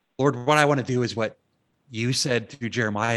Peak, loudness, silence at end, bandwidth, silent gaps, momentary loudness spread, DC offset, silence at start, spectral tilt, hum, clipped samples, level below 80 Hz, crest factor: -2 dBFS; -24 LUFS; 0 s; 12.5 kHz; none; 10 LU; under 0.1%; 0.2 s; -4.5 dB/octave; none; under 0.1%; -66 dBFS; 22 dB